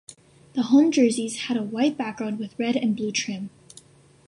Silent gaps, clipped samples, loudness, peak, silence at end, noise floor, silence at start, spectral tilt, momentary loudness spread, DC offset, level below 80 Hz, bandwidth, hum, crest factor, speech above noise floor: none; under 0.1%; -24 LUFS; -8 dBFS; 0.8 s; -52 dBFS; 0.1 s; -4.5 dB/octave; 13 LU; under 0.1%; -68 dBFS; 11.5 kHz; none; 16 dB; 29 dB